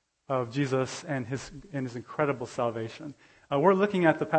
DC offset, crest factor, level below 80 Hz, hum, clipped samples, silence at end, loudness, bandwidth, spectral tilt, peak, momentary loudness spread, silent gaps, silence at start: under 0.1%; 22 dB; -64 dBFS; none; under 0.1%; 0 s; -29 LUFS; 8.8 kHz; -6.5 dB/octave; -8 dBFS; 14 LU; none; 0.3 s